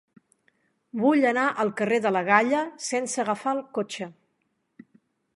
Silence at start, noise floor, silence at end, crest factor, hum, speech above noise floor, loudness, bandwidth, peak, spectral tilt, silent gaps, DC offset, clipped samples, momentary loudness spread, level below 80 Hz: 0.95 s; -74 dBFS; 1.25 s; 22 dB; none; 50 dB; -24 LUFS; 11.5 kHz; -4 dBFS; -4 dB/octave; none; under 0.1%; under 0.1%; 12 LU; -78 dBFS